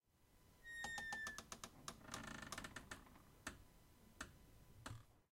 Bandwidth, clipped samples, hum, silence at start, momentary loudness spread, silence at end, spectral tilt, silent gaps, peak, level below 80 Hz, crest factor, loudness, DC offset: 16.5 kHz; under 0.1%; none; 0.15 s; 19 LU; 0.15 s; -2.5 dB/octave; none; -32 dBFS; -70 dBFS; 24 dB; -53 LUFS; under 0.1%